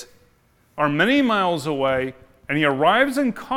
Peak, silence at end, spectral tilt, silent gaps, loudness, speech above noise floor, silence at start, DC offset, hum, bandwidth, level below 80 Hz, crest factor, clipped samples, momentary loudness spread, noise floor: -4 dBFS; 0 s; -5.5 dB/octave; none; -20 LUFS; 40 dB; 0 s; under 0.1%; none; 16 kHz; -56 dBFS; 16 dB; under 0.1%; 8 LU; -59 dBFS